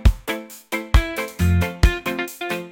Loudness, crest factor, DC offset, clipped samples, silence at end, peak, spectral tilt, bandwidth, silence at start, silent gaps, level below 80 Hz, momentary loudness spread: -22 LUFS; 16 dB; under 0.1%; under 0.1%; 0 s; -4 dBFS; -5.5 dB/octave; 17 kHz; 0 s; none; -24 dBFS; 9 LU